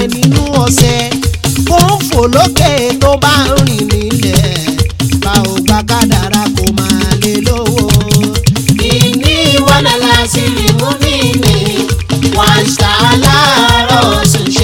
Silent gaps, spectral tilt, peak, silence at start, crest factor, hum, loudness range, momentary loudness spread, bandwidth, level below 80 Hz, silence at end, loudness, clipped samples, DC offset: none; -4.5 dB/octave; 0 dBFS; 0 s; 8 dB; none; 2 LU; 5 LU; 19.5 kHz; -22 dBFS; 0 s; -9 LUFS; 1%; under 0.1%